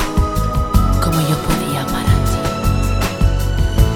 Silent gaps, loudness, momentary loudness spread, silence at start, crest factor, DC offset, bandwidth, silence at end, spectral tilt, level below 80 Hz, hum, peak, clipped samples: none; -17 LUFS; 3 LU; 0 s; 14 dB; under 0.1%; 18 kHz; 0 s; -6 dB/octave; -18 dBFS; none; 0 dBFS; under 0.1%